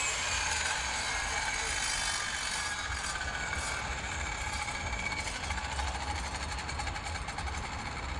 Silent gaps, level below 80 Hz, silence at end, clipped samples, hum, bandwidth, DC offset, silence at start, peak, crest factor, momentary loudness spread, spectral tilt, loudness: none; -44 dBFS; 0 s; under 0.1%; none; 11.5 kHz; under 0.1%; 0 s; -18 dBFS; 16 dB; 7 LU; -1.5 dB/octave; -33 LUFS